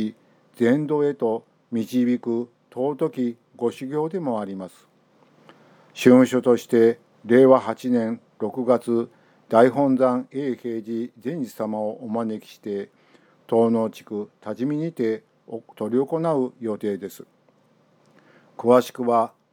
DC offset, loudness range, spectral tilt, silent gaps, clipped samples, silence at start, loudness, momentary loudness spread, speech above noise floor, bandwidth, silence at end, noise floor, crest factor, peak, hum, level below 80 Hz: under 0.1%; 9 LU; -7 dB/octave; none; under 0.1%; 0 s; -22 LUFS; 15 LU; 39 dB; 17.5 kHz; 0.25 s; -60 dBFS; 22 dB; -2 dBFS; none; -78 dBFS